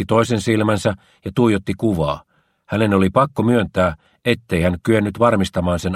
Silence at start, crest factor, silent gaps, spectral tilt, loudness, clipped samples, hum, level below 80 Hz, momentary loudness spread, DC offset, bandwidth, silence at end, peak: 0 s; 18 dB; none; -6.5 dB/octave; -18 LUFS; under 0.1%; none; -42 dBFS; 7 LU; under 0.1%; 15 kHz; 0 s; 0 dBFS